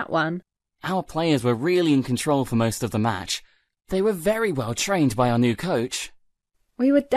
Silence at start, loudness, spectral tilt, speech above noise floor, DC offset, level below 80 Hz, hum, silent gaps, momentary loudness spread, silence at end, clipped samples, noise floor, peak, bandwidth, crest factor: 0 s; -23 LUFS; -5.5 dB/octave; 48 dB; under 0.1%; -52 dBFS; none; none; 8 LU; 0 s; under 0.1%; -70 dBFS; -8 dBFS; 14 kHz; 16 dB